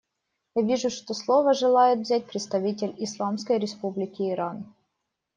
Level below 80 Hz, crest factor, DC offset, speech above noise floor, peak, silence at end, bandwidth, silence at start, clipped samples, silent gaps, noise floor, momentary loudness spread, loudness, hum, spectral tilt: -72 dBFS; 18 dB; under 0.1%; 56 dB; -8 dBFS; 0.7 s; 9.4 kHz; 0.55 s; under 0.1%; none; -81 dBFS; 11 LU; -25 LUFS; none; -5 dB/octave